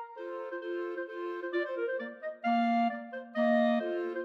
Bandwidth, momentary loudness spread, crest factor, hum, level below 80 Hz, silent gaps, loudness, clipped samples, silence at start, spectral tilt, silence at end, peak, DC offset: 6.2 kHz; 12 LU; 14 dB; none; under -90 dBFS; none; -33 LUFS; under 0.1%; 0 s; -7 dB/octave; 0 s; -18 dBFS; under 0.1%